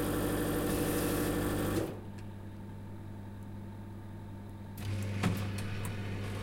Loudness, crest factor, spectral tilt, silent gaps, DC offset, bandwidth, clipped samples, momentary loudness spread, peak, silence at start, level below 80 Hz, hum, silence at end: -37 LUFS; 16 dB; -5.5 dB/octave; none; under 0.1%; 16.5 kHz; under 0.1%; 14 LU; -20 dBFS; 0 s; -48 dBFS; none; 0 s